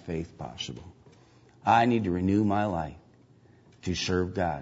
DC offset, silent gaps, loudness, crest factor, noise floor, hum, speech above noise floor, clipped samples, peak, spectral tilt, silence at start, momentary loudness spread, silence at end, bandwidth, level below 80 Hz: under 0.1%; none; -28 LUFS; 20 dB; -58 dBFS; none; 31 dB; under 0.1%; -10 dBFS; -6 dB/octave; 0.05 s; 16 LU; 0 s; 8 kHz; -54 dBFS